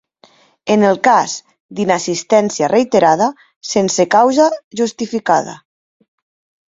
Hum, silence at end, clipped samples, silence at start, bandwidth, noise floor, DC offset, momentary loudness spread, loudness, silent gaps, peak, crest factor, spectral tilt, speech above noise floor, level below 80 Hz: none; 1.1 s; under 0.1%; 0.65 s; 7.8 kHz; -50 dBFS; under 0.1%; 11 LU; -14 LUFS; 1.60-1.69 s, 3.56-3.61 s, 4.64-4.71 s; 0 dBFS; 16 dB; -4 dB/octave; 37 dB; -60 dBFS